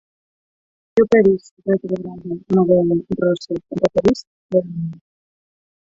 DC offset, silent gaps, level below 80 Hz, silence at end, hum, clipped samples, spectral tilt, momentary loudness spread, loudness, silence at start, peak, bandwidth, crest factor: under 0.1%; 1.51-1.57 s, 4.27-4.49 s; -52 dBFS; 0.95 s; none; under 0.1%; -8 dB/octave; 13 LU; -19 LUFS; 0.95 s; -2 dBFS; 7.8 kHz; 18 dB